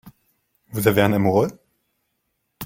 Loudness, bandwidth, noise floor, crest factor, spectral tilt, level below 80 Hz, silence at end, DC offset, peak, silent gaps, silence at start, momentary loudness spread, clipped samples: -19 LUFS; 16.5 kHz; -74 dBFS; 20 dB; -6 dB/octave; -54 dBFS; 0 s; under 0.1%; -2 dBFS; none; 0.05 s; 9 LU; under 0.1%